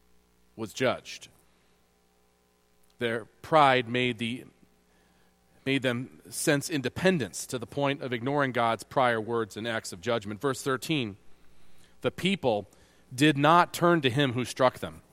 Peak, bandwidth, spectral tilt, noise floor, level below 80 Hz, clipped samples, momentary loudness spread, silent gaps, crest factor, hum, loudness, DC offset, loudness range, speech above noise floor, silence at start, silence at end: -6 dBFS; 16.5 kHz; -5 dB/octave; -67 dBFS; -64 dBFS; under 0.1%; 14 LU; none; 22 dB; none; -27 LUFS; under 0.1%; 5 LU; 39 dB; 0.55 s; 0.15 s